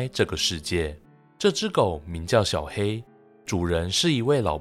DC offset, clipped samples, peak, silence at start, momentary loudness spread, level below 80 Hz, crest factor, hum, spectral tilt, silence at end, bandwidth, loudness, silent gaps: under 0.1%; under 0.1%; -6 dBFS; 0 s; 9 LU; -46 dBFS; 20 dB; none; -4.5 dB/octave; 0 s; 15.5 kHz; -25 LUFS; none